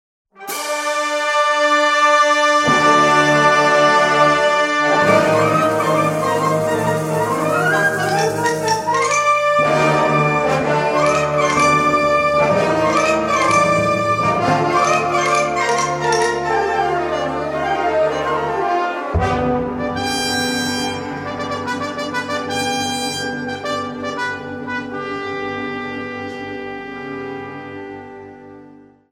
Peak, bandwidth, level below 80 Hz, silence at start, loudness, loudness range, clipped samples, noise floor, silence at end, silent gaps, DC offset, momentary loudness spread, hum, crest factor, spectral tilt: -2 dBFS; 16.5 kHz; -44 dBFS; 0.4 s; -16 LUFS; 11 LU; under 0.1%; -44 dBFS; 0.4 s; none; under 0.1%; 13 LU; none; 16 dB; -4 dB/octave